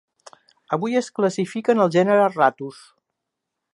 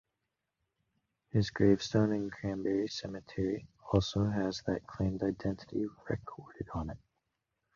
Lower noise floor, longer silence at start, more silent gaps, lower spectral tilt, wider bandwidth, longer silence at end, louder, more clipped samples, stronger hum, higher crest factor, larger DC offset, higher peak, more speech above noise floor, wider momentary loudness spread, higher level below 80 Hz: second, -81 dBFS vs -86 dBFS; second, 0.7 s vs 1.35 s; neither; about the same, -6 dB/octave vs -7 dB/octave; first, 11.5 kHz vs 7.4 kHz; first, 1.05 s vs 0.8 s; first, -20 LUFS vs -34 LUFS; neither; neither; about the same, 18 dB vs 22 dB; neither; first, -4 dBFS vs -14 dBFS; first, 62 dB vs 53 dB; about the same, 11 LU vs 13 LU; second, -76 dBFS vs -52 dBFS